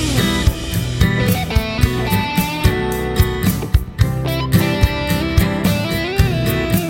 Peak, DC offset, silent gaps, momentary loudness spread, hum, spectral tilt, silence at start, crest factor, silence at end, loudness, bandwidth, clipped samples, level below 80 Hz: 0 dBFS; under 0.1%; none; 3 LU; none; -5.5 dB/octave; 0 s; 16 dB; 0 s; -17 LUFS; 16.5 kHz; under 0.1%; -24 dBFS